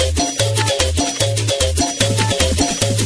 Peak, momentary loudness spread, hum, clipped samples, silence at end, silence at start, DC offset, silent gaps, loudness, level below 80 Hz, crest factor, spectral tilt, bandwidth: 0 dBFS; 1 LU; none; under 0.1%; 0 s; 0 s; under 0.1%; none; -16 LUFS; -28 dBFS; 16 dB; -3.5 dB/octave; 11 kHz